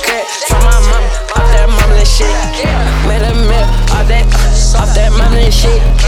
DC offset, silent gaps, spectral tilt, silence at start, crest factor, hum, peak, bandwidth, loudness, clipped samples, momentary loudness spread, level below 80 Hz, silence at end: under 0.1%; none; -4.5 dB/octave; 0 s; 8 dB; none; 0 dBFS; 14 kHz; -11 LUFS; under 0.1%; 4 LU; -8 dBFS; 0 s